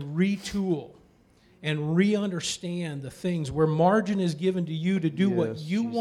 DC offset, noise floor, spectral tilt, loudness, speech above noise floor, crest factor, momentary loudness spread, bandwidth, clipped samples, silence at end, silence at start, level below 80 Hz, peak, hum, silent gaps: under 0.1%; -59 dBFS; -6 dB/octave; -27 LUFS; 34 dB; 16 dB; 10 LU; 12.5 kHz; under 0.1%; 0 s; 0 s; -58 dBFS; -10 dBFS; none; none